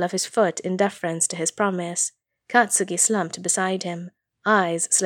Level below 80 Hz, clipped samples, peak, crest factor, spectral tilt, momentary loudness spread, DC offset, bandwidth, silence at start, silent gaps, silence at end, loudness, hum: -78 dBFS; under 0.1%; -2 dBFS; 20 dB; -3 dB/octave; 8 LU; under 0.1%; 19 kHz; 0 s; none; 0 s; -22 LUFS; none